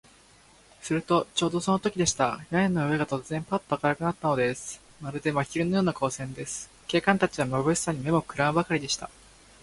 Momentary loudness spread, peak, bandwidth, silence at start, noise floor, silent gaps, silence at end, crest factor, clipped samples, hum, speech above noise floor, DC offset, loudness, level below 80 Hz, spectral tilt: 10 LU; -4 dBFS; 11.5 kHz; 0.8 s; -56 dBFS; none; 0.55 s; 24 dB; under 0.1%; none; 30 dB; under 0.1%; -27 LUFS; -56 dBFS; -4.5 dB/octave